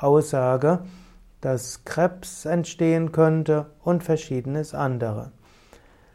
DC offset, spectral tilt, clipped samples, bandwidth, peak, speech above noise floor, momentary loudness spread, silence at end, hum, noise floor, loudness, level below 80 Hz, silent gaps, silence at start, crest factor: under 0.1%; -7 dB/octave; under 0.1%; 14 kHz; -6 dBFS; 30 dB; 11 LU; 0.85 s; none; -52 dBFS; -24 LUFS; -54 dBFS; none; 0 s; 16 dB